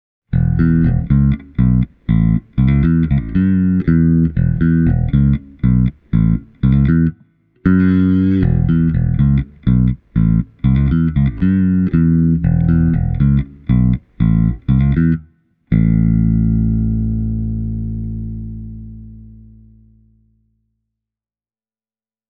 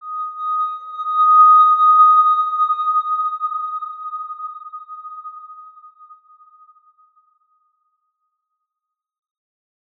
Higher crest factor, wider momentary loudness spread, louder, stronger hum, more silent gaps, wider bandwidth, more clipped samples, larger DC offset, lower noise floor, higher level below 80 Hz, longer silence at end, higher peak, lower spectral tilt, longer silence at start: about the same, 14 dB vs 16 dB; second, 7 LU vs 24 LU; about the same, -15 LUFS vs -14 LUFS; neither; neither; about the same, 3.9 kHz vs 4 kHz; neither; neither; first, under -90 dBFS vs -83 dBFS; first, -24 dBFS vs under -90 dBFS; second, 3.1 s vs 4.3 s; first, 0 dBFS vs -4 dBFS; first, -12.5 dB/octave vs 1.5 dB/octave; first, 0.3 s vs 0.05 s